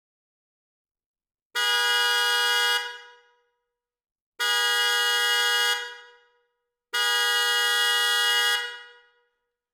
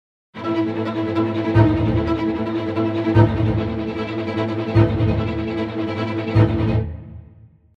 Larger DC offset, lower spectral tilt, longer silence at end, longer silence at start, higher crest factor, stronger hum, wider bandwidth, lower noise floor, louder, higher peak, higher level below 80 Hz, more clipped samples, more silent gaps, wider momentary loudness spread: neither; second, 6 dB/octave vs -9.5 dB/octave; first, 0.85 s vs 0.55 s; first, 1.55 s vs 0.35 s; about the same, 20 dB vs 18 dB; neither; first, over 20 kHz vs 6 kHz; first, -83 dBFS vs -47 dBFS; about the same, -22 LUFS vs -20 LUFS; second, -8 dBFS vs -2 dBFS; second, -90 dBFS vs -34 dBFS; neither; first, 4.12-4.32 s vs none; about the same, 9 LU vs 8 LU